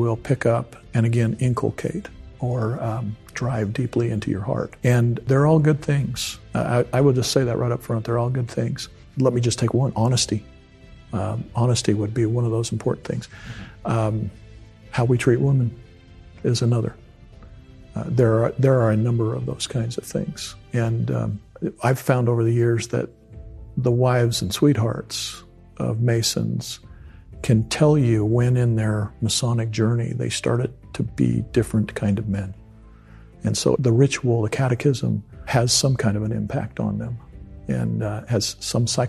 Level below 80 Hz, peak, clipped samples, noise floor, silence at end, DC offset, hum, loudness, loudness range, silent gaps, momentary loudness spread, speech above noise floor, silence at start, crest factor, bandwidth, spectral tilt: -46 dBFS; -2 dBFS; under 0.1%; -46 dBFS; 0 s; under 0.1%; none; -22 LUFS; 4 LU; none; 11 LU; 25 dB; 0 s; 20 dB; 13 kHz; -6 dB/octave